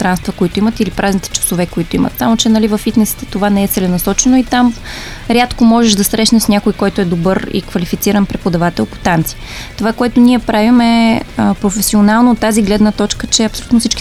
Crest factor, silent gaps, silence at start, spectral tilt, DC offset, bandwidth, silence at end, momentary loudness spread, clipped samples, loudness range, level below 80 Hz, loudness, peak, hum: 12 dB; none; 0 s; -4.5 dB/octave; under 0.1%; 16 kHz; 0 s; 7 LU; under 0.1%; 3 LU; -30 dBFS; -12 LUFS; 0 dBFS; none